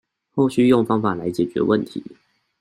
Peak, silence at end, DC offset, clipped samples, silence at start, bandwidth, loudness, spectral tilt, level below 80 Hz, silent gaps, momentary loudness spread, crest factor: -4 dBFS; 0.5 s; under 0.1%; under 0.1%; 0.35 s; 13 kHz; -20 LUFS; -7.5 dB/octave; -58 dBFS; none; 13 LU; 16 dB